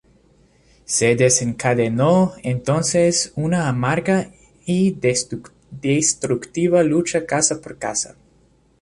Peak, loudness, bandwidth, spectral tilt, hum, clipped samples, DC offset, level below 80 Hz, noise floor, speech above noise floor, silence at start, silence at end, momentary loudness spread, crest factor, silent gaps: -2 dBFS; -19 LUFS; 11.5 kHz; -4.5 dB/octave; none; under 0.1%; under 0.1%; -52 dBFS; -57 dBFS; 38 dB; 0.9 s; 0.75 s; 9 LU; 18 dB; none